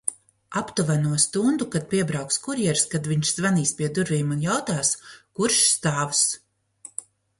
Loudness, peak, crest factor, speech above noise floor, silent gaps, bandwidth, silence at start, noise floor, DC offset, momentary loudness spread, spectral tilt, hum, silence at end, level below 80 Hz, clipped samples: -23 LUFS; -6 dBFS; 18 dB; 25 dB; none; 11.5 kHz; 0.05 s; -49 dBFS; under 0.1%; 11 LU; -3.5 dB/octave; none; 0.4 s; -60 dBFS; under 0.1%